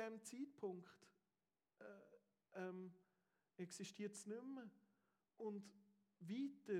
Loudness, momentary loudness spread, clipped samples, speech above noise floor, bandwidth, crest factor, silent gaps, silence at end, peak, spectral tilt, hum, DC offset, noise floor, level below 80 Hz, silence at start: -54 LUFS; 14 LU; under 0.1%; over 38 dB; 15.5 kHz; 20 dB; none; 0 s; -36 dBFS; -5 dB/octave; none; under 0.1%; under -90 dBFS; under -90 dBFS; 0 s